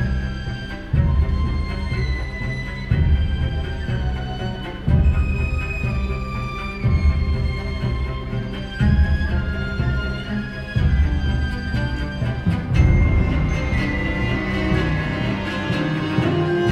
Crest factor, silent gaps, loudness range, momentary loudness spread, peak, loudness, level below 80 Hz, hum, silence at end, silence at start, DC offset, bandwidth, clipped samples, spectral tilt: 16 dB; none; 3 LU; 8 LU; -4 dBFS; -22 LUFS; -24 dBFS; none; 0 s; 0 s; under 0.1%; 8.4 kHz; under 0.1%; -7.5 dB/octave